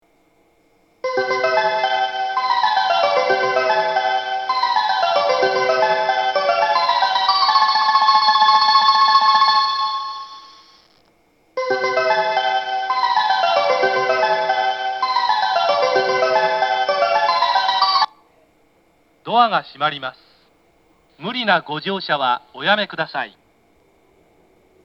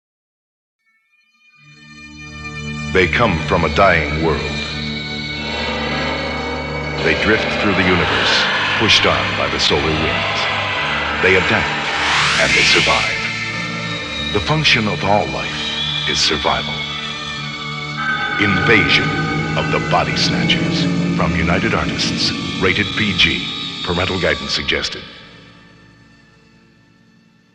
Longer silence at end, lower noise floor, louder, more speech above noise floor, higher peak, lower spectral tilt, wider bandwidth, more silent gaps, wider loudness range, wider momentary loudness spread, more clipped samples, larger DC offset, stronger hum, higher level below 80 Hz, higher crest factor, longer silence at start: second, 1.55 s vs 2.05 s; about the same, -59 dBFS vs -59 dBFS; about the same, -17 LUFS vs -16 LUFS; second, 37 dB vs 44 dB; about the same, 0 dBFS vs 0 dBFS; about the same, -3 dB/octave vs -4 dB/octave; second, 7.2 kHz vs 11.5 kHz; neither; about the same, 8 LU vs 6 LU; about the same, 10 LU vs 11 LU; neither; neither; neither; second, -72 dBFS vs -36 dBFS; about the same, 18 dB vs 18 dB; second, 1.05 s vs 1.8 s